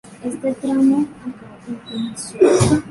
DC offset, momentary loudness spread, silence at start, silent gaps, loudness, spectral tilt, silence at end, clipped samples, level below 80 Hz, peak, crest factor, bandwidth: under 0.1%; 19 LU; 0.05 s; none; -18 LUFS; -6 dB/octave; 0 s; under 0.1%; -44 dBFS; -2 dBFS; 16 dB; 11.5 kHz